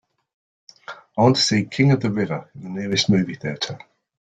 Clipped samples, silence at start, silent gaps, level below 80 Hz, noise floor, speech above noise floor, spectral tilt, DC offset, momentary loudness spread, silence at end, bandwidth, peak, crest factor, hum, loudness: under 0.1%; 0.9 s; none; -56 dBFS; -41 dBFS; 21 dB; -5 dB/octave; under 0.1%; 16 LU; 0.45 s; 9.2 kHz; -2 dBFS; 20 dB; none; -20 LUFS